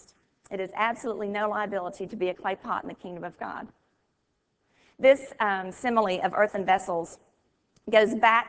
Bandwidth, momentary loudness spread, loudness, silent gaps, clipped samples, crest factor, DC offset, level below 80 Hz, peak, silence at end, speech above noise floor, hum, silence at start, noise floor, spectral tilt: 8 kHz; 17 LU; -27 LUFS; none; under 0.1%; 22 dB; under 0.1%; -66 dBFS; -6 dBFS; 0 s; 49 dB; none; 0.5 s; -76 dBFS; -4.5 dB/octave